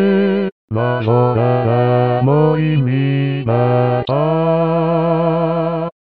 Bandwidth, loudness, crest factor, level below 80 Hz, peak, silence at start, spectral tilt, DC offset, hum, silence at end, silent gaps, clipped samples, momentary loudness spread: 4.8 kHz; -15 LUFS; 12 dB; -52 dBFS; -2 dBFS; 0 s; -11.5 dB/octave; 0.5%; none; 0.25 s; 0.52-0.68 s; under 0.1%; 5 LU